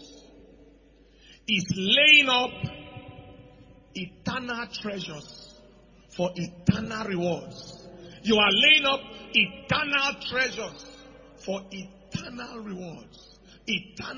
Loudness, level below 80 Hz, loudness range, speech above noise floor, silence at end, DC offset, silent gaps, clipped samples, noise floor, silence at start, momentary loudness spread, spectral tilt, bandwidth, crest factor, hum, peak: -23 LUFS; -56 dBFS; 14 LU; 30 dB; 0 s; under 0.1%; none; under 0.1%; -56 dBFS; 0 s; 25 LU; -3.5 dB/octave; 7.4 kHz; 24 dB; none; -4 dBFS